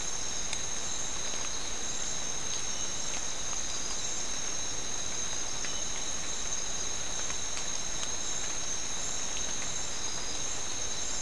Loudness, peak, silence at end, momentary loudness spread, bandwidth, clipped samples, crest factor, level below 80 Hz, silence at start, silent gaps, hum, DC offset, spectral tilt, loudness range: -33 LUFS; -16 dBFS; 0 s; 1 LU; 12 kHz; under 0.1%; 20 dB; -50 dBFS; 0 s; none; none; 2%; -0.5 dB/octave; 0 LU